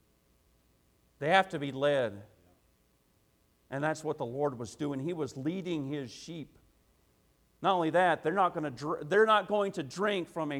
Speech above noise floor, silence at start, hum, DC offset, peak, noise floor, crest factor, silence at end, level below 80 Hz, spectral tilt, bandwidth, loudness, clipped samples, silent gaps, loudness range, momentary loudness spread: 39 dB; 1.2 s; none; under 0.1%; -10 dBFS; -70 dBFS; 22 dB; 0 s; -72 dBFS; -5.5 dB/octave; 15.5 kHz; -31 LUFS; under 0.1%; none; 8 LU; 12 LU